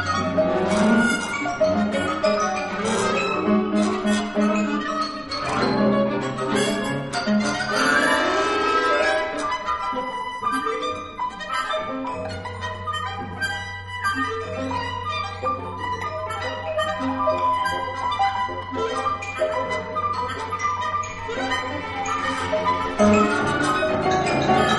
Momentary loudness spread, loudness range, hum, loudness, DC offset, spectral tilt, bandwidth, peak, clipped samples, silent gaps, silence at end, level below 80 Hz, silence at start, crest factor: 9 LU; 6 LU; none; -23 LUFS; under 0.1%; -4.5 dB/octave; 11.5 kHz; -6 dBFS; under 0.1%; none; 0 s; -50 dBFS; 0 s; 18 dB